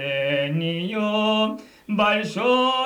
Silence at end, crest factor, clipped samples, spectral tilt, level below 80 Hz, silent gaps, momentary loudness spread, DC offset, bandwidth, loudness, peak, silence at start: 0 s; 14 dB; under 0.1%; -5.5 dB/octave; -64 dBFS; none; 6 LU; under 0.1%; 13 kHz; -22 LUFS; -8 dBFS; 0 s